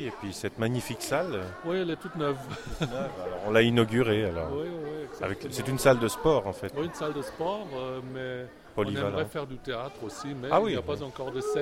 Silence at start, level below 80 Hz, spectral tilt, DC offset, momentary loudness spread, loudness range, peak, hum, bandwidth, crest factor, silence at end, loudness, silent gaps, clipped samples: 0 s; -52 dBFS; -5.5 dB/octave; under 0.1%; 12 LU; 6 LU; -8 dBFS; none; 16 kHz; 22 dB; 0 s; -30 LUFS; none; under 0.1%